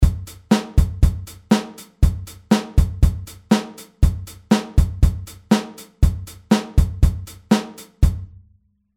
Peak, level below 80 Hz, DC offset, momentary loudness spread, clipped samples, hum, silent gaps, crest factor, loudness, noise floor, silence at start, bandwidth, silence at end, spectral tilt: -2 dBFS; -22 dBFS; under 0.1%; 15 LU; under 0.1%; none; none; 18 dB; -20 LUFS; -58 dBFS; 0 s; 16 kHz; 0.7 s; -6.5 dB/octave